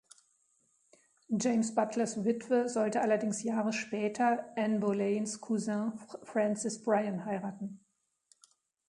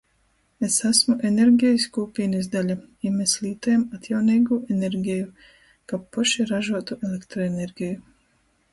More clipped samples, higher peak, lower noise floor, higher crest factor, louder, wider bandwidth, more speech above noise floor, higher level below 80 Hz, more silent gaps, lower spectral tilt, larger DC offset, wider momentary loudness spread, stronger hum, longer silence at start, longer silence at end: neither; second, -14 dBFS vs -4 dBFS; first, -77 dBFS vs -65 dBFS; about the same, 20 dB vs 18 dB; second, -32 LUFS vs -23 LUFS; about the same, 11 kHz vs 11.5 kHz; about the same, 45 dB vs 43 dB; second, -78 dBFS vs -60 dBFS; neither; about the same, -5 dB/octave vs -4 dB/octave; neither; second, 7 LU vs 12 LU; neither; first, 1.3 s vs 0.6 s; first, 1.15 s vs 0.7 s